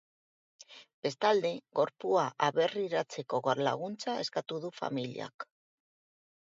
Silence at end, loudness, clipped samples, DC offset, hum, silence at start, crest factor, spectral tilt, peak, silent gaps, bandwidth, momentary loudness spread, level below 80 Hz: 1.15 s; -33 LUFS; under 0.1%; under 0.1%; none; 0.7 s; 22 dB; -5 dB/octave; -12 dBFS; 0.94-1.02 s, 5.34-5.39 s; 8 kHz; 15 LU; -84 dBFS